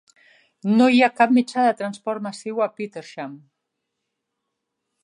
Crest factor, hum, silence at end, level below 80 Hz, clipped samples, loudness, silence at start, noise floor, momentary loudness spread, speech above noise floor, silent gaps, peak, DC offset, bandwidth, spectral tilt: 20 dB; none; 1.65 s; -78 dBFS; under 0.1%; -20 LUFS; 0.65 s; -80 dBFS; 18 LU; 59 dB; none; -2 dBFS; under 0.1%; 10.5 kHz; -5.5 dB/octave